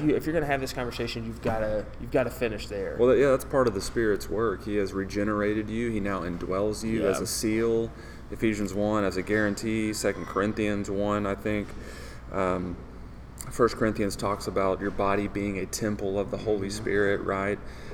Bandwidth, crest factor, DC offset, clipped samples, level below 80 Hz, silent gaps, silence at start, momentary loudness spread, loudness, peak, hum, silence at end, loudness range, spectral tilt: 19.5 kHz; 20 dB; under 0.1%; under 0.1%; -44 dBFS; none; 0 s; 8 LU; -28 LUFS; -8 dBFS; none; 0 s; 4 LU; -5.5 dB/octave